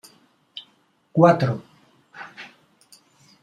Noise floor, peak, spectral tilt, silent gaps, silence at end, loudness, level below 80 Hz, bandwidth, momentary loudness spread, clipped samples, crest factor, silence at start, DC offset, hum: -62 dBFS; -2 dBFS; -8 dB/octave; none; 0.95 s; -20 LUFS; -66 dBFS; 12.5 kHz; 25 LU; under 0.1%; 24 dB; 0.55 s; under 0.1%; none